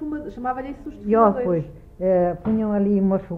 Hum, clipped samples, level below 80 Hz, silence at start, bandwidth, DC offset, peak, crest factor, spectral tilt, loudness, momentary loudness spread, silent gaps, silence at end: none; under 0.1%; -46 dBFS; 0 s; 3.8 kHz; under 0.1%; -2 dBFS; 18 dB; -11 dB/octave; -21 LUFS; 13 LU; none; 0 s